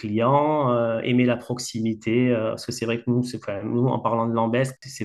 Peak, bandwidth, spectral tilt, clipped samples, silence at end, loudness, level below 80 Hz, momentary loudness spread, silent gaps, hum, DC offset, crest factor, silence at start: -8 dBFS; 12.5 kHz; -6.5 dB/octave; under 0.1%; 0 s; -23 LUFS; -64 dBFS; 8 LU; none; none; under 0.1%; 16 dB; 0 s